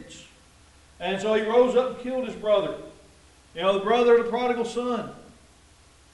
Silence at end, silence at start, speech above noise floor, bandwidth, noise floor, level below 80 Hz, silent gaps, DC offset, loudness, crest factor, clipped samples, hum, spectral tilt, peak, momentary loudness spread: 0.9 s; 0 s; 32 dB; 11.5 kHz; -55 dBFS; -58 dBFS; none; under 0.1%; -24 LUFS; 18 dB; under 0.1%; none; -5 dB/octave; -8 dBFS; 19 LU